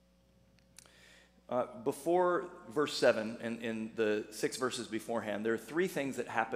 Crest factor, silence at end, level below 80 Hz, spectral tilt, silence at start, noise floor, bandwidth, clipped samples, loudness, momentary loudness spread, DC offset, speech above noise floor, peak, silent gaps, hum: 22 dB; 0 s; -72 dBFS; -4.5 dB/octave; 1.5 s; -67 dBFS; 15.5 kHz; under 0.1%; -35 LUFS; 9 LU; under 0.1%; 33 dB; -14 dBFS; none; none